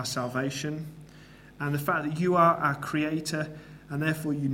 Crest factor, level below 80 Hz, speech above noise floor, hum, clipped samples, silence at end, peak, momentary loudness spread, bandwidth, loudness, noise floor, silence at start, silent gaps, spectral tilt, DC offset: 20 dB; -60 dBFS; 23 dB; none; under 0.1%; 0 s; -8 dBFS; 15 LU; 16.5 kHz; -28 LUFS; -51 dBFS; 0 s; none; -5.5 dB/octave; under 0.1%